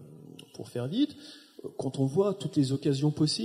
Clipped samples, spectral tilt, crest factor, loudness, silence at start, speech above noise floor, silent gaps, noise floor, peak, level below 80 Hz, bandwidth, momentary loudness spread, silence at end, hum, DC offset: under 0.1%; -6.5 dB/octave; 16 dB; -29 LUFS; 0 s; 20 dB; none; -49 dBFS; -14 dBFS; -70 dBFS; 13.5 kHz; 20 LU; 0 s; none; under 0.1%